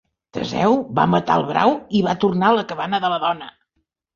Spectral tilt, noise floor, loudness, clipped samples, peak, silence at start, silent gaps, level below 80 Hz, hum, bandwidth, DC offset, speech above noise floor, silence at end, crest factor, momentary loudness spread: -6.5 dB/octave; -73 dBFS; -19 LUFS; under 0.1%; -2 dBFS; 0.35 s; none; -54 dBFS; none; 7.2 kHz; under 0.1%; 54 dB; 0.65 s; 18 dB; 11 LU